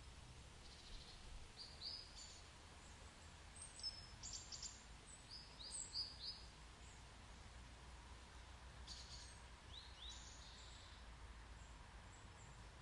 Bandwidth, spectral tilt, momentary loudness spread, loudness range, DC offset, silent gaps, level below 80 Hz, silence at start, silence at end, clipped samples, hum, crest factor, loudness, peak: 11.5 kHz; -2 dB/octave; 11 LU; 7 LU; under 0.1%; none; -62 dBFS; 0 s; 0 s; under 0.1%; none; 20 dB; -55 LUFS; -36 dBFS